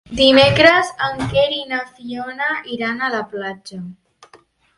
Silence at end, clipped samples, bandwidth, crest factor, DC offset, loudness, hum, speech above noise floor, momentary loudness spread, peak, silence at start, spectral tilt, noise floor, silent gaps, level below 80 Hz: 0.85 s; under 0.1%; 11.5 kHz; 18 dB; under 0.1%; -16 LUFS; none; 34 dB; 19 LU; 0 dBFS; 0.1 s; -4.5 dB/octave; -51 dBFS; none; -46 dBFS